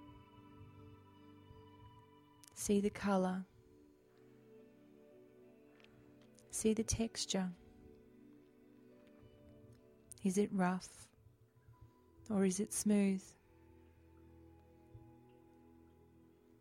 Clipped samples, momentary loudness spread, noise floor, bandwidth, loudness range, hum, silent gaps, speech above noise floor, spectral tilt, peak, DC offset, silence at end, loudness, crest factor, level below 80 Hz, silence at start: under 0.1%; 27 LU; -67 dBFS; 16 kHz; 6 LU; none; none; 31 dB; -5 dB/octave; -22 dBFS; under 0.1%; 1.6 s; -37 LUFS; 20 dB; -66 dBFS; 0 s